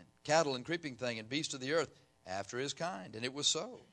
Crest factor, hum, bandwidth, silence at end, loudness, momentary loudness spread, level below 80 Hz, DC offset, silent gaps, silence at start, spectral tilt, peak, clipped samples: 22 dB; none; 11 kHz; 0.1 s; -36 LUFS; 9 LU; -76 dBFS; under 0.1%; none; 0 s; -3 dB/octave; -16 dBFS; under 0.1%